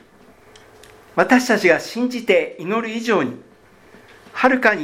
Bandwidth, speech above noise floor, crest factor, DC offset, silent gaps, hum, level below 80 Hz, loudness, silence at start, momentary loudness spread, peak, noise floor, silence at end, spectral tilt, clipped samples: 16 kHz; 31 dB; 20 dB; under 0.1%; none; none; -60 dBFS; -18 LUFS; 1.15 s; 11 LU; 0 dBFS; -49 dBFS; 0 s; -4.5 dB/octave; under 0.1%